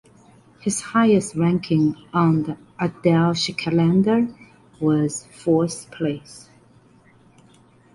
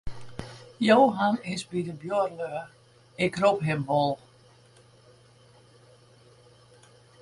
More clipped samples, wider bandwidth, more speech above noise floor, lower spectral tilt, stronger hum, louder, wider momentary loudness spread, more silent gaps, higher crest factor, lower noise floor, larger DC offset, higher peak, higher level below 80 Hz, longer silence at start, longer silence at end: neither; about the same, 11.5 kHz vs 11.5 kHz; about the same, 33 dB vs 32 dB; about the same, -6 dB/octave vs -6 dB/octave; neither; first, -21 LUFS vs -26 LUFS; second, 10 LU vs 22 LU; neither; second, 16 dB vs 22 dB; second, -53 dBFS vs -57 dBFS; neither; about the same, -4 dBFS vs -6 dBFS; about the same, -56 dBFS vs -56 dBFS; first, 0.65 s vs 0.05 s; second, 1.55 s vs 3.05 s